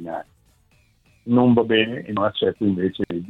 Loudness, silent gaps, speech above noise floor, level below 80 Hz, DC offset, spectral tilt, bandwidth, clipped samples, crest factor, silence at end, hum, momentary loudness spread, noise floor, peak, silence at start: -20 LUFS; none; 39 dB; -56 dBFS; under 0.1%; -8.5 dB/octave; 4.1 kHz; under 0.1%; 18 dB; 0 s; none; 16 LU; -59 dBFS; -4 dBFS; 0 s